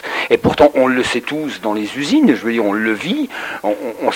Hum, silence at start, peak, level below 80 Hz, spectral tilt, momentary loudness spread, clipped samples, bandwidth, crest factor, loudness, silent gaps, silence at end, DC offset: none; 0 s; 0 dBFS; -46 dBFS; -5 dB/octave; 9 LU; under 0.1%; 16.5 kHz; 16 dB; -16 LUFS; none; 0 s; under 0.1%